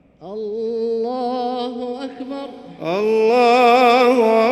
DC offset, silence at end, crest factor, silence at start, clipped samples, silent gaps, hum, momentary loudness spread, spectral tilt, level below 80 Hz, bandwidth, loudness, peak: under 0.1%; 0 s; 14 dB; 0.2 s; under 0.1%; none; none; 17 LU; -5 dB/octave; -64 dBFS; 13.5 kHz; -16 LUFS; -2 dBFS